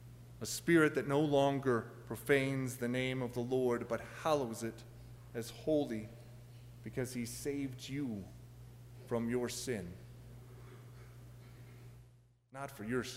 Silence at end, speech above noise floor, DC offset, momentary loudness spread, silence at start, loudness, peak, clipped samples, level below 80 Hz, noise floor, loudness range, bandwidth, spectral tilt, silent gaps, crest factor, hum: 0 s; 29 dB; under 0.1%; 23 LU; 0 s; -36 LUFS; -16 dBFS; under 0.1%; -64 dBFS; -65 dBFS; 10 LU; 16 kHz; -5.5 dB/octave; none; 22 dB; none